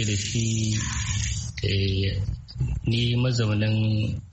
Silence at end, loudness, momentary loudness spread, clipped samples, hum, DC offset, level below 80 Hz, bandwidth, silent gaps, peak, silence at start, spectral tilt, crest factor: 0 s; -25 LUFS; 6 LU; under 0.1%; none; under 0.1%; -36 dBFS; 8.4 kHz; none; -12 dBFS; 0 s; -4.5 dB/octave; 14 dB